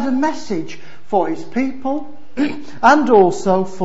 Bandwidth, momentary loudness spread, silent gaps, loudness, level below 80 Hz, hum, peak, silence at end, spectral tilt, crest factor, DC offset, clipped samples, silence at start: 8 kHz; 14 LU; none; -17 LUFS; -52 dBFS; none; 0 dBFS; 0 s; -6 dB/octave; 16 dB; 6%; under 0.1%; 0 s